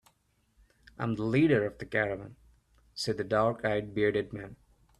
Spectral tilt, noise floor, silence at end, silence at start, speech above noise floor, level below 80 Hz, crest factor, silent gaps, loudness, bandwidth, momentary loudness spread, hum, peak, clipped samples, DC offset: -6.5 dB/octave; -71 dBFS; 0.45 s; 1 s; 42 dB; -60 dBFS; 20 dB; none; -30 LUFS; 12.5 kHz; 17 LU; none; -12 dBFS; under 0.1%; under 0.1%